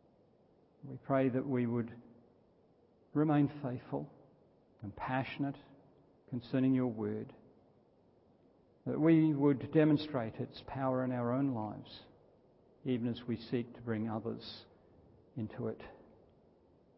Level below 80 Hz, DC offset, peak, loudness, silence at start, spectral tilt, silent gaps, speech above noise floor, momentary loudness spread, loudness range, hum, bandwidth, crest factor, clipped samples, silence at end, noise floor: -70 dBFS; under 0.1%; -16 dBFS; -35 LUFS; 0.85 s; -7 dB/octave; none; 34 dB; 20 LU; 8 LU; none; 5.6 kHz; 20 dB; under 0.1%; 1 s; -68 dBFS